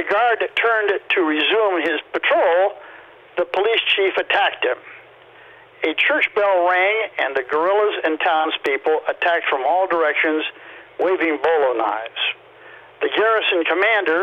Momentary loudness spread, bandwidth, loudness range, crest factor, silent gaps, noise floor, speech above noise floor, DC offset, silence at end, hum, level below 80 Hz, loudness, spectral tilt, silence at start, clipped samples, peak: 7 LU; 7.2 kHz; 2 LU; 16 dB; none; -45 dBFS; 27 dB; under 0.1%; 0 s; none; -68 dBFS; -18 LUFS; -4 dB/octave; 0 s; under 0.1%; -4 dBFS